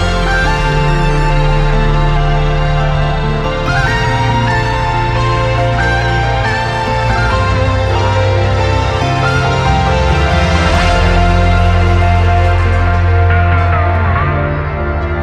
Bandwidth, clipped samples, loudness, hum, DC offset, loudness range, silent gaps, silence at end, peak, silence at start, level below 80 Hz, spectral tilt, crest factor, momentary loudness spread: 9.8 kHz; under 0.1%; -12 LUFS; none; under 0.1%; 2 LU; none; 0 s; 0 dBFS; 0 s; -16 dBFS; -6 dB/octave; 10 dB; 3 LU